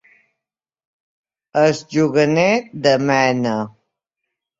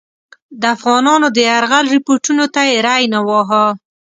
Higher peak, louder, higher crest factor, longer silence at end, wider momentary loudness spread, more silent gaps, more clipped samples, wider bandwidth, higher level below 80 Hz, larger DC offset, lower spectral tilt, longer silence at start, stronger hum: about the same, -2 dBFS vs 0 dBFS; second, -17 LUFS vs -12 LUFS; about the same, 18 dB vs 14 dB; first, 0.9 s vs 0.3 s; first, 8 LU vs 4 LU; neither; neither; second, 7.8 kHz vs 9.6 kHz; about the same, -60 dBFS vs -64 dBFS; neither; first, -5.5 dB/octave vs -2.5 dB/octave; first, 1.55 s vs 0.5 s; neither